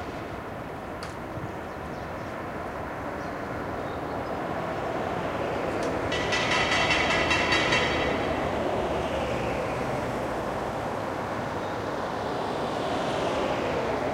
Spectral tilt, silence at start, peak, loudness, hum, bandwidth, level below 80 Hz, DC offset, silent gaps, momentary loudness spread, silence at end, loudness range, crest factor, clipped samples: -4.5 dB/octave; 0 s; -10 dBFS; -28 LUFS; none; 16 kHz; -46 dBFS; under 0.1%; none; 13 LU; 0 s; 10 LU; 18 dB; under 0.1%